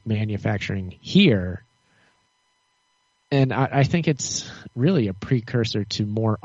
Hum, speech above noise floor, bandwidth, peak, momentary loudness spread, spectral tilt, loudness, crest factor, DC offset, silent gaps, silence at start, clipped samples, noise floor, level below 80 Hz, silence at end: none; 46 dB; 8 kHz; -4 dBFS; 11 LU; -5.5 dB/octave; -22 LUFS; 18 dB; under 0.1%; none; 0.05 s; under 0.1%; -68 dBFS; -54 dBFS; 0.05 s